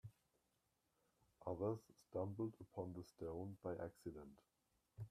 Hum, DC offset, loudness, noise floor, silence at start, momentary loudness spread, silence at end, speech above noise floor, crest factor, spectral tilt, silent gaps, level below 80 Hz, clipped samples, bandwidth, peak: none; under 0.1%; -50 LUFS; -86 dBFS; 0.05 s; 14 LU; 0 s; 37 dB; 20 dB; -9 dB/octave; none; -76 dBFS; under 0.1%; 14.5 kHz; -30 dBFS